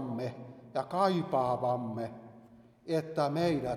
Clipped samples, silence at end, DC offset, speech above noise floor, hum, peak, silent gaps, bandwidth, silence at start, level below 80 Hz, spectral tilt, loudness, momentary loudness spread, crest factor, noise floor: under 0.1%; 0 s; under 0.1%; 26 dB; none; -14 dBFS; none; 14.5 kHz; 0 s; -66 dBFS; -7 dB/octave; -33 LUFS; 13 LU; 18 dB; -57 dBFS